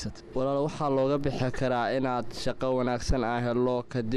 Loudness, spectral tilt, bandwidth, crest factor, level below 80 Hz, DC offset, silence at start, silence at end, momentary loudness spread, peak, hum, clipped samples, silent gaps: -29 LUFS; -6.5 dB/octave; 12.5 kHz; 14 dB; -42 dBFS; under 0.1%; 0 s; 0 s; 4 LU; -14 dBFS; none; under 0.1%; none